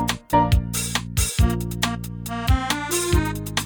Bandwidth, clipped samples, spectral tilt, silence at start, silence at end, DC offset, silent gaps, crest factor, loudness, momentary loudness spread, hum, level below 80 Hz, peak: over 20 kHz; under 0.1%; -4 dB/octave; 0 s; 0 s; under 0.1%; none; 16 dB; -22 LUFS; 5 LU; none; -28 dBFS; -6 dBFS